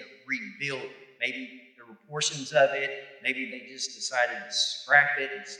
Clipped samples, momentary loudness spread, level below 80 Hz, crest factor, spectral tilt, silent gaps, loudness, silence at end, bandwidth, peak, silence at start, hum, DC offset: under 0.1%; 16 LU; under -90 dBFS; 24 dB; -1.5 dB/octave; none; -27 LUFS; 0 s; 11.5 kHz; -6 dBFS; 0 s; none; under 0.1%